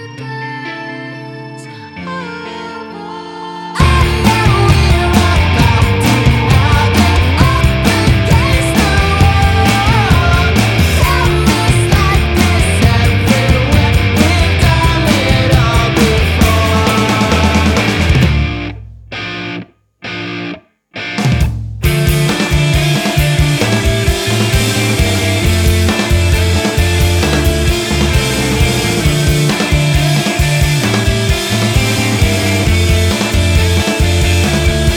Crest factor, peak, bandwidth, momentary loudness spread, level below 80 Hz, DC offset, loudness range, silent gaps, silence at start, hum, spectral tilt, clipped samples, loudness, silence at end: 10 dB; 0 dBFS; 19 kHz; 13 LU; -18 dBFS; under 0.1%; 6 LU; none; 0 s; none; -5 dB/octave; under 0.1%; -11 LUFS; 0 s